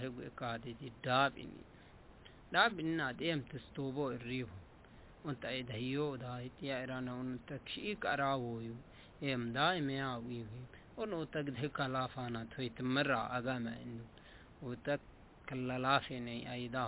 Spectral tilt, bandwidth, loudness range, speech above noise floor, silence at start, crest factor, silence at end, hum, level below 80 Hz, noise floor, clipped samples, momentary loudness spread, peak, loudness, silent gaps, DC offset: -4 dB/octave; 4 kHz; 5 LU; 20 dB; 0 s; 24 dB; 0 s; none; -64 dBFS; -59 dBFS; under 0.1%; 18 LU; -16 dBFS; -39 LUFS; none; under 0.1%